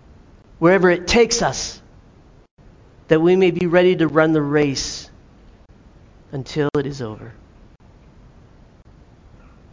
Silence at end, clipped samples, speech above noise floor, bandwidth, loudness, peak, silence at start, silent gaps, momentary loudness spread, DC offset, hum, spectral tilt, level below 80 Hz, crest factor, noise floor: 2.4 s; under 0.1%; 31 dB; 7.6 kHz; -17 LUFS; 0 dBFS; 0.6 s; 2.51-2.57 s; 17 LU; under 0.1%; none; -5 dB/octave; -44 dBFS; 20 dB; -48 dBFS